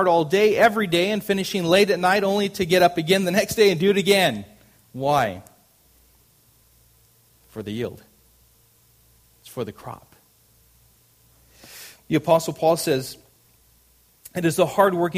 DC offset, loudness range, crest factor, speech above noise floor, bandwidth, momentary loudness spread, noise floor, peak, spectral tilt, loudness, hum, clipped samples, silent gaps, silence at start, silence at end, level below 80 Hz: under 0.1%; 21 LU; 20 dB; 38 dB; 15.5 kHz; 21 LU; -58 dBFS; -2 dBFS; -4.5 dB/octave; -20 LUFS; none; under 0.1%; none; 0 s; 0 s; -58 dBFS